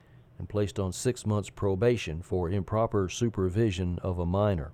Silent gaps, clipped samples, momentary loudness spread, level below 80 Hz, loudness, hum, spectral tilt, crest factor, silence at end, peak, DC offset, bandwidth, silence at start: none; under 0.1%; 5 LU; -48 dBFS; -29 LUFS; none; -6.5 dB/octave; 16 dB; 0 s; -14 dBFS; under 0.1%; 13.5 kHz; 0.4 s